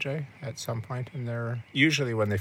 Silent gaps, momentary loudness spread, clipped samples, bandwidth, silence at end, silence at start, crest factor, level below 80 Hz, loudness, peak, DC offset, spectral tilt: none; 12 LU; under 0.1%; 16.5 kHz; 0 s; 0 s; 20 dB; -70 dBFS; -29 LUFS; -10 dBFS; under 0.1%; -5 dB/octave